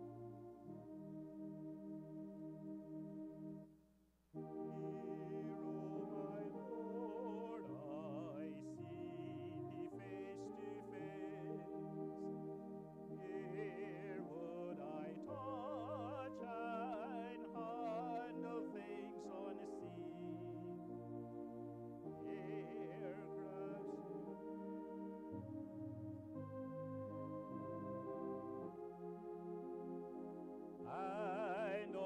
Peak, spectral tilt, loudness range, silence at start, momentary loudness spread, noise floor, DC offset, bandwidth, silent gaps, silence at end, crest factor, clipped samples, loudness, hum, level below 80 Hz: -34 dBFS; -8.5 dB/octave; 4 LU; 0 s; 6 LU; -75 dBFS; under 0.1%; 10 kHz; none; 0 s; 16 dB; under 0.1%; -50 LUFS; none; -80 dBFS